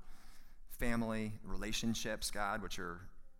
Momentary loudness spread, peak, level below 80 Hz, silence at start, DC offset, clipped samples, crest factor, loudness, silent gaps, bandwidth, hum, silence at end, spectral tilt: 9 LU; -22 dBFS; -48 dBFS; 0 s; under 0.1%; under 0.1%; 18 dB; -40 LUFS; none; 17 kHz; none; 0 s; -4 dB/octave